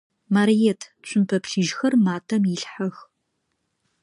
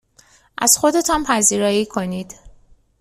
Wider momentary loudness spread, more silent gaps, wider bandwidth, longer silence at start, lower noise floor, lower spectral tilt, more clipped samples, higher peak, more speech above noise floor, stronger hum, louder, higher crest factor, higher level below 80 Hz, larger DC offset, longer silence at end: second, 11 LU vs 16 LU; neither; second, 11 kHz vs 15.5 kHz; second, 0.3 s vs 0.6 s; first, -75 dBFS vs -53 dBFS; first, -5.5 dB/octave vs -2.5 dB/octave; neither; second, -8 dBFS vs 0 dBFS; first, 54 dB vs 36 dB; neither; second, -22 LUFS vs -16 LUFS; about the same, 16 dB vs 20 dB; second, -72 dBFS vs -46 dBFS; neither; first, 1 s vs 0.5 s